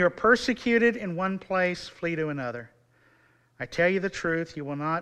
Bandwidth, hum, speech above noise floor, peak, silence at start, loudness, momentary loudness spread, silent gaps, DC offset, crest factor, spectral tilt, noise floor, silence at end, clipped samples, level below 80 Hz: 11.5 kHz; none; 36 dB; -6 dBFS; 0 s; -26 LUFS; 12 LU; none; under 0.1%; 20 dB; -5.5 dB/octave; -63 dBFS; 0 s; under 0.1%; -58 dBFS